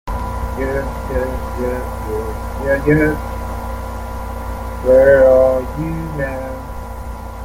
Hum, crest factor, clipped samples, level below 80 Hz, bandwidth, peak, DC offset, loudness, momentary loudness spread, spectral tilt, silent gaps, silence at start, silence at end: none; 16 dB; under 0.1%; -26 dBFS; 16.5 kHz; -2 dBFS; under 0.1%; -17 LUFS; 17 LU; -7.5 dB/octave; none; 0.05 s; 0 s